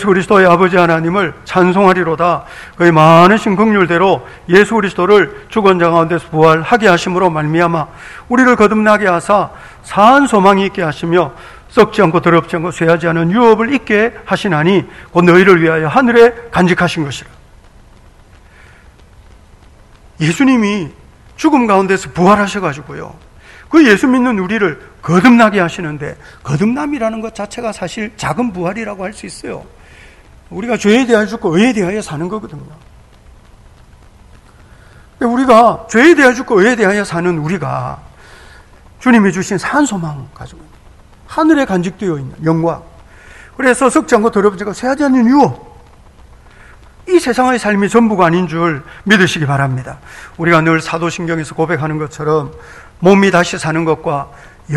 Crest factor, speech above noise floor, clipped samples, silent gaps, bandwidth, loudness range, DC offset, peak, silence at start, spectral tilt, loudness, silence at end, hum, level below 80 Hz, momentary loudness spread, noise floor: 12 dB; 30 dB; 0.9%; none; 12.5 kHz; 8 LU; under 0.1%; 0 dBFS; 0 s; -6 dB/octave; -12 LUFS; 0 s; none; -42 dBFS; 14 LU; -42 dBFS